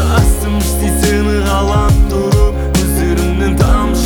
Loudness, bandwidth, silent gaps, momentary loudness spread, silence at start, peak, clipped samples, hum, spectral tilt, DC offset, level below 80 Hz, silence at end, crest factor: -13 LUFS; over 20 kHz; none; 2 LU; 0 s; 0 dBFS; under 0.1%; none; -5.5 dB/octave; under 0.1%; -14 dBFS; 0 s; 12 dB